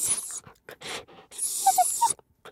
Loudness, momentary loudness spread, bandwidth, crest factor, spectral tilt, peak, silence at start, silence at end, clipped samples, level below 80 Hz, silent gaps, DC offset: -26 LUFS; 16 LU; 16.5 kHz; 20 dB; 0.5 dB/octave; -8 dBFS; 0 s; 0 s; under 0.1%; -68 dBFS; none; under 0.1%